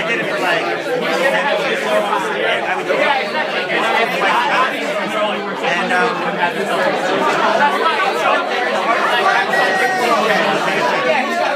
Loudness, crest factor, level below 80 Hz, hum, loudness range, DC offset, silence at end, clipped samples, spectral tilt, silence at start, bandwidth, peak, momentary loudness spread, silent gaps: -16 LUFS; 14 dB; -76 dBFS; none; 2 LU; under 0.1%; 0 s; under 0.1%; -3.5 dB/octave; 0 s; 15.5 kHz; -2 dBFS; 4 LU; none